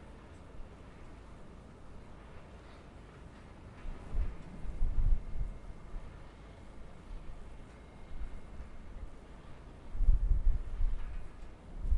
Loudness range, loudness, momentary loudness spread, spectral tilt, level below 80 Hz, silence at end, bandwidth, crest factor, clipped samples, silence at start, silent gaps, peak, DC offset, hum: 13 LU; -44 LUFS; 18 LU; -7.5 dB/octave; -36 dBFS; 0 s; 4.2 kHz; 22 dB; under 0.1%; 0 s; none; -14 dBFS; under 0.1%; none